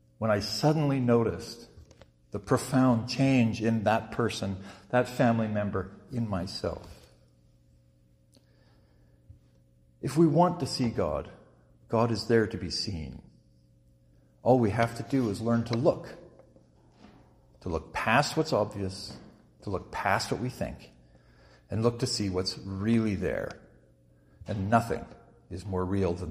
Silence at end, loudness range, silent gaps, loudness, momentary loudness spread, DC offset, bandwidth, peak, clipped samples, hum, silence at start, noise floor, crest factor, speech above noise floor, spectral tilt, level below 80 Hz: 0 s; 5 LU; none; -29 LUFS; 16 LU; under 0.1%; 15.5 kHz; -8 dBFS; under 0.1%; none; 0.2 s; -63 dBFS; 22 dB; 35 dB; -6 dB/octave; -54 dBFS